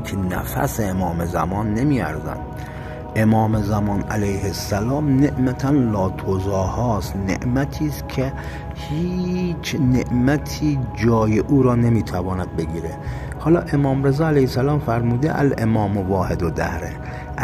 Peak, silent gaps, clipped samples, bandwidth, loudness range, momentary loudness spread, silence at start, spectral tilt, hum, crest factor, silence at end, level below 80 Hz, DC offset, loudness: -4 dBFS; none; under 0.1%; 15 kHz; 4 LU; 10 LU; 0 s; -7 dB/octave; none; 14 dB; 0 s; -34 dBFS; under 0.1%; -21 LUFS